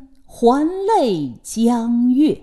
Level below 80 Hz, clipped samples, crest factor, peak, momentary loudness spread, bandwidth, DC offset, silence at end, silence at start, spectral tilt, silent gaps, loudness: -50 dBFS; under 0.1%; 14 dB; -2 dBFS; 5 LU; 12.5 kHz; under 0.1%; 0 s; 0 s; -6 dB/octave; none; -17 LUFS